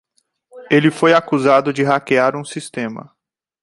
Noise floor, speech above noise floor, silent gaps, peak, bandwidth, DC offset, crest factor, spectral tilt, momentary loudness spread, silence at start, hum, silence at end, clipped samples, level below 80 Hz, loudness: -60 dBFS; 45 dB; none; -2 dBFS; 11.5 kHz; under 0.1%; 16 dB; -5.5 dB/octave; 14 LU; 0.55 s; none; 0.6 s; under 0.1%; -64 dBFS; -16 LUFS